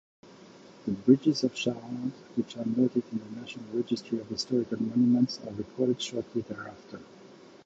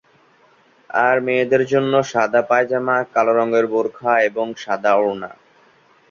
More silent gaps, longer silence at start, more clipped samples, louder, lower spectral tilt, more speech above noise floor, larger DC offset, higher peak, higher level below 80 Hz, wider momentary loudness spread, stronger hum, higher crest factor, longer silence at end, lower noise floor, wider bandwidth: neither; second, 0.25 s vs 0.95 s; neither; second, -29 LUFS vs -18 LUFS; about the same, -6 dB/octave vs -5.5 dB/octave; second, 23 dB vs 37 dB; neither; second, -8 dBFS vs -2 dBFS; about the same, -68 dBFS vs -66 dBFS; first, 16 LU vs 7 LU; neither; first, 22 dB vs 16 dB; second, 0.3 s vs 0.8 s; about the same, -52 dBFS vs -54 dBFS; about the same, 7.8 kHz vs 7.4 kHz